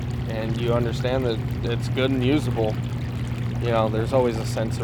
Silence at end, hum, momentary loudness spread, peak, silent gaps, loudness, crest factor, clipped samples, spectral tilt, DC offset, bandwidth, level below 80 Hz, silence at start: 0 s; 60 Hz at -30 dBFS; 6 LU; -6 dBFS; none; -24 LUFS; 16 dB; under 0.1%; -7 dB/octave; under 0.1%; 17 kHz; -38 dBFS; 0 s